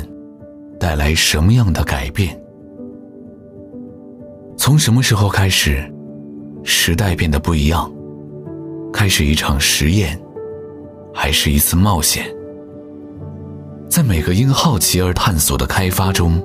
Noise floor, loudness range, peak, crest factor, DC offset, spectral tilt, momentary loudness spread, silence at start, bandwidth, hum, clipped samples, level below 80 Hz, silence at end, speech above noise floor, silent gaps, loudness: -37 dBFS; 3 LU; -2 dBFS; 14 dB; under 0.1%; -4 dB/octave; 21 LU; 0 s; 16 kHz; none; under 0.1%; -26 dBFS; 0 s; 22 dB; none; -15 LUFS